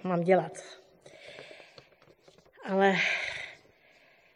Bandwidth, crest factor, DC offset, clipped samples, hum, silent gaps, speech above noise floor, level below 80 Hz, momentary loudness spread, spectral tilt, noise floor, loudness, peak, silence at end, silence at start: 11 kHz; 20 dB; under 0.1%; under 0.1%; none; none; 34 dB; -74 dBFS; 25 LU; -5.5 dB/octave; -62 dBFS; -28 LUFS; -12 dBFS; 0.8 s; 0.05 s